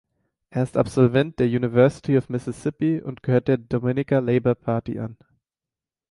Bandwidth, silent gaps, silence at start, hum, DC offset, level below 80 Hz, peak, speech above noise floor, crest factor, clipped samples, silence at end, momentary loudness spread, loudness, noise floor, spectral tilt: 11.5 kHz; none; 0.55 s; none; under 0.1%; -54 dBFS; -4 dBFS; over 69 dB; 18 dB; under 0.1%; 0.95 s; 10 LU; -22 LUFS; under -90 dBFS; -8.5 dB/octave